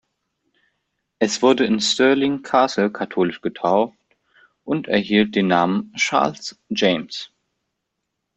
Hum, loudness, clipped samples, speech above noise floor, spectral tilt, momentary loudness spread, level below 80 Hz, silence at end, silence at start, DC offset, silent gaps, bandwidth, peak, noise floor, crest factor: none; -19 LUFS; under 0.1%; 59 dB; -4.5 dB/octave; 10 LU; -62 dBFS; 1.1 s; 1.2 s; under 0.1%; none; 8.4 kHz; -2 dBFS; -78 dBFS; 18 dB